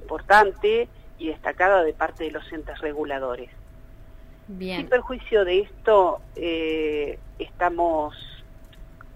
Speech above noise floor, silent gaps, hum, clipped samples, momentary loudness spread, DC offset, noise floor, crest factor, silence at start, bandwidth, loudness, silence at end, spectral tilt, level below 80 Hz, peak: 21 dB; none; none; under 0.1%; 17 LU; under 0.1%; -44 dBFS; 20 dB; 0 s; 15.5 kHz; -23 LUFS; 0 s; -5.5 dB/octave; -44 dBFS; -4 dBFS